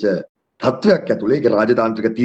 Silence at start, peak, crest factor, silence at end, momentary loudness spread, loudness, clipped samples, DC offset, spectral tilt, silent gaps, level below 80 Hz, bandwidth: 0 s; -2 dBFS; 14 dB; 0 s; 6 LU; -17 LUFS; under 0.1%; under 0.1%; -7.5 dB/octave; 0.29-0.35 s; -56 dBFS; 8.2 kHz